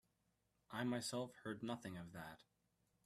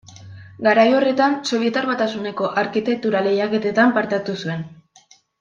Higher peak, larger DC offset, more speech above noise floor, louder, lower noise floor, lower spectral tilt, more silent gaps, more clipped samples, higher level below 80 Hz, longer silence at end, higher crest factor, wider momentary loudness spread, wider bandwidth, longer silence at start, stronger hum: second, -28 dBFS vs -2 dBFS; neither; about the same, 37 dB vs 34 dB; second, -48 LUFS vs -19 LUFS; first, -84 dBFS vs -53 dBFS; about the same, -4.5 dB/octave vs -5.5 dB/octave; neither; neither; second, -80 dBFS vs -66 dBFS; about the same, 0.65 s vs 0.65 s; first, 22 dB vs 16 dB; first, 13 LU vs 10 LU; first, 15 kHz vs 9 kHz; first, 0.7 s vs 0.1 s; neither